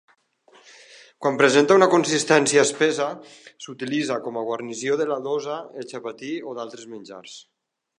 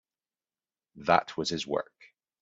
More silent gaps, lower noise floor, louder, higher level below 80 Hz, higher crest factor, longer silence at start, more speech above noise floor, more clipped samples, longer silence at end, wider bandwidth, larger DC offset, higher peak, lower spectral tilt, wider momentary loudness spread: neither; second, -57 dBFS vs under -90 dBFS; first, -21 LUFS vs -29 LUFS; second, -78 dBFS vs -68 dBFS; about the same, 22 dB vs 26 dB; first, 1.2 s vs 0.95 s; second, 35 dB vs over 61 dB; neither; about the same, 0.55 s vs 0.6 s; first, 11 kHz vs 8 kHz; neither; first, -2 dBFS vs -8 dBFS; about the same, -3.5 dB/octave vs -4 dB/octave; first, 23 LU vs 10 LU